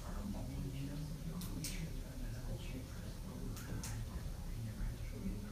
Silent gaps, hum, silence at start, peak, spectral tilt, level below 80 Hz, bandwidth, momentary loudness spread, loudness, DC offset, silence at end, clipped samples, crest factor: none; none; 0 s; -30 dBFS; -5.5 dB/octave; -46 dBFS; 15.5 kHz; 4 LU; -46 LUFS; under 0.1%; 0 s; under 0.1%; 14 dB